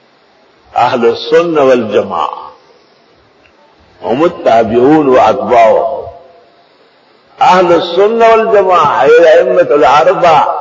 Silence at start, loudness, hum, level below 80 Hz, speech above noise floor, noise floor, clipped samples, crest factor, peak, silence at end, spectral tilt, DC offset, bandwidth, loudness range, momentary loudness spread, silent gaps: 0.75 s; -8 LUFS; none; -46 dBFS; 39 dB; -47 dBFS; 0.5%; 10 dB; 0 dBFS; 0 s; -5.5 dB/octave; under 0.1%; 7.6 kHz; 7 LU; 11 LU; none